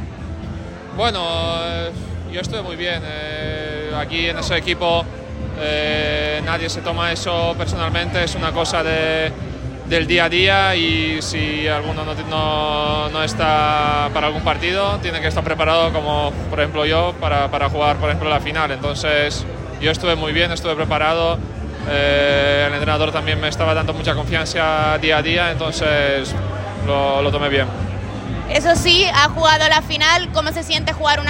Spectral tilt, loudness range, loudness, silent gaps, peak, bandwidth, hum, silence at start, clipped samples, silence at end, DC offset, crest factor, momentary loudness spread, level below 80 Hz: -4.5 dB/octave; 6 LU; -18 LUFS; none; 0 dBFS; 16 kHz; none; 0 s; under 0.1%; 0 s; under 0.1%; 18 dB; 11 LU; -34 dBFS